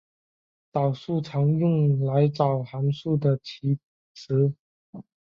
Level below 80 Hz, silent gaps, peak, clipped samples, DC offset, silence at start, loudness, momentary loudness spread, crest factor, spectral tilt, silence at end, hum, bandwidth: -64 dBFS; 3.84-4.15 s, 4.59-4.93 s; -8 dBFS; under 0.1%; under 0.1%; 0.75 s; -25 LUFS; 7 LU; 16 dB; -9.5 dB/octave; 0.3 s; none; 6.8 kHz